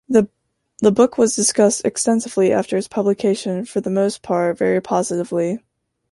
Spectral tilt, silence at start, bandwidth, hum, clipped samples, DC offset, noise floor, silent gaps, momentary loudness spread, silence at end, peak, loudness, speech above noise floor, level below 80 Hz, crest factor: -4.5 dB/octave; 0.1 s; 11.5 kHz; none; under 0.1%; under 0.1%; -71 dBFS; none; 7 LU; 0.55 s; -2 dBFS; -18 LUFS; 53 dB; -60 dBFS; 16 dB